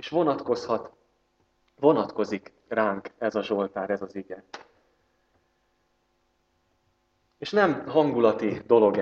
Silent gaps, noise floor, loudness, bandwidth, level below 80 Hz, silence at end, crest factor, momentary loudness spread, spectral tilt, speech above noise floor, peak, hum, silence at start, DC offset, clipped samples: none; -71 dBFS; -25 LUFS; 7.2 kHz; -68 dBFS; 0 s; 20 dB; 16 LU; -6.5 dB/octave; 46 dB; -6 dBFS; none; 0 s; under 0.1%; under 0.1%